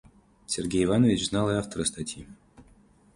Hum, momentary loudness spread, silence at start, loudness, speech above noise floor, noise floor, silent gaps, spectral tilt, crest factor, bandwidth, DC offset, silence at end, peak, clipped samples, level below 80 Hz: none; 14 LU; 0.5 s; -26 LUFS; 32 dB; -58 dBFS; none; -5 dB/octave; 18 dB; 11.5 kHz; under 0.1%; 0.55 s; -10 dBFS; under 0.1%; -50 dBFS